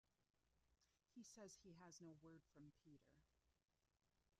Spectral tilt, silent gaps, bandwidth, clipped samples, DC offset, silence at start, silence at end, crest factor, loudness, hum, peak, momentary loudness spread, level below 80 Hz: -4.5 dB/octave; 0.30-0.34 s; 11.5 kHz; under 0.1%; under 0.1%; 0.1 s; 0.05 s; 20 dB; -65 LUFS; none; -50 dBFS; 6 LU; -88 dBFS